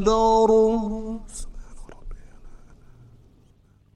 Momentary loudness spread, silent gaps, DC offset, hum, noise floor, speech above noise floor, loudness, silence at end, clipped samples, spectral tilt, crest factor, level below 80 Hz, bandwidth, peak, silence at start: 24 LU; none; under 0.1%; none; -57 dBFS; 37 dB; -20 LUFS; 1.4 s; under 0.1%; -6 dB/octave; 18 dB; -38 dBFS; 11 kHz; -8 dBFS; 0 s